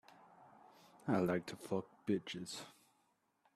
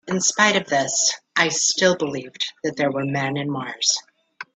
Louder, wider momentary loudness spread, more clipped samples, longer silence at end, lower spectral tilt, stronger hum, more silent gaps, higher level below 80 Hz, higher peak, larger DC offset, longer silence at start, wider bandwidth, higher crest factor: second, -41 LUFS vs -20 LUFS; first, 13 LU vs 10 LU; neither; first, 0.85 s vs 0.1 s; first, -6 dB/octave vs -2 dB/octave; neither; neither; second, -78 dBFS vs -66 dBFS; second, -22 dBFS vs -2 dBFS; neither; first, 0.4 s vs 0.05 s; first, 14 kHz vs 9.6 kHz; about the same, 20 dB vs 20 dB